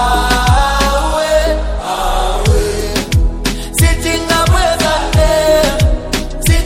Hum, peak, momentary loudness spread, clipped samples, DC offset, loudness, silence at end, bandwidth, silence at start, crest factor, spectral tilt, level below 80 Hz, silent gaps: none; 0 dBFS; 6 LU; under 0.1%; under 0.1%; -13 LUFS; 0 s; 17 kHz; 0 s; 12 dB; -4.5 dB/octave; -16 dBFS; none